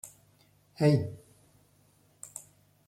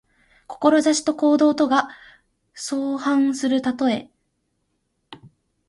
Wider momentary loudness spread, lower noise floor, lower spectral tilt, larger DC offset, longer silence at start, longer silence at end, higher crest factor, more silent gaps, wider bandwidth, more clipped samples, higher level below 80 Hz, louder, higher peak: first, 23 LU vs 11 LU; second, -65 dBFS vs -72 dBFS; first, -7 dB/octave vs -3.5 dB/octave; neither; second, 0.05 s vs 0.5 s; about the same, 0.5 s vs 0.4 s; about the same, 22 dB vs 18 dB; neither; first, 14 kHz vs 11.5 kHz; neither; about the same, -66 dBFS vs -66 dBFS; second, -28 LUFS vs -20 LUFS; second, -12 dBFS vs -4 dBFS